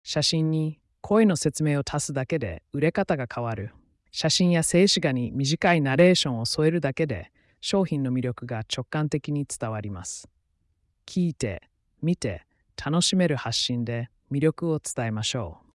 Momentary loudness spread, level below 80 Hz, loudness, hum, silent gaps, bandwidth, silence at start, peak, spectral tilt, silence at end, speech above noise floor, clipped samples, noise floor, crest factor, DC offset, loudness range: 13 LU; -56 dBFS; -25 LUFS; none; none; 12 kHz; 0.05 s; -8 dBFS; -5 dB/octave; 0.2 s; 46 dB; under 0.1%; -71 dBFS; 18 dB; under 0.1%; 9 LU